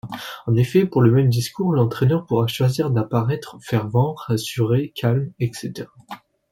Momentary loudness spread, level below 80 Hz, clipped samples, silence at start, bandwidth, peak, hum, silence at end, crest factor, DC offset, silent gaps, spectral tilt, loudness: 16 LU; -52 dBFS; under 0.1%; 0.05 s; 16.5 kHz; -4 dBFS; none; 0.35 s; 16 dB; under 0.1%; none; -7 dB/octave; -20 LUFS